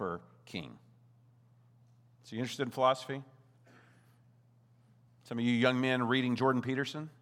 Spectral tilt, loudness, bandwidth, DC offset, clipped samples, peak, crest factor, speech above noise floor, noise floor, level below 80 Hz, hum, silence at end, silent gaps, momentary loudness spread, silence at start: -6 dB/octave; -33 LUFS; 14 kHz; under 0.1%; under 0.1%; -12 dBFS; 24 dB; 33 dB; -65 dBFS; -80 dBFS; none; 0.1 s; none; 15 LU; 0 s